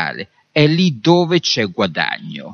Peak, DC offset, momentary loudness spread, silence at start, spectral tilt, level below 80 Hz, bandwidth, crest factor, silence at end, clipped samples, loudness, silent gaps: 0 dBFS; under 0.1%; 10 LU; 0 s; -5.5 dB/octave; -58 dBFS; 6.8 kHz; 16 dB; 0 s; under 0.1%; -16 LUFS; none